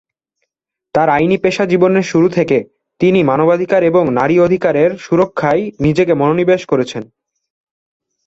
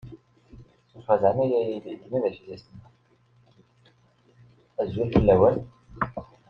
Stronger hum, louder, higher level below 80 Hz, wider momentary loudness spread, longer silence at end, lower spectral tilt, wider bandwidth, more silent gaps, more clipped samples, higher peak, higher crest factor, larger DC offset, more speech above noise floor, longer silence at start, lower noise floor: neither; first, -13 LUFS vs -24 LUFS; about the same, -50 dBFS vs -46 dBFS; second, 5 LU vs 23 LU; first, 1.2 s vs 0.25 s; second, -7 dB/octave vs -10 dB/octave; first, 8 kHz vs 5.8 kHz; neither; neither; first, 0 dBFS vs -4 dBFS; second, 14 dB vs 22 dB; neither; first, 66 dB vs 38 dB; first, 0.95 s vs 0.05 s; first, -78 dBFS vs -62 dBFS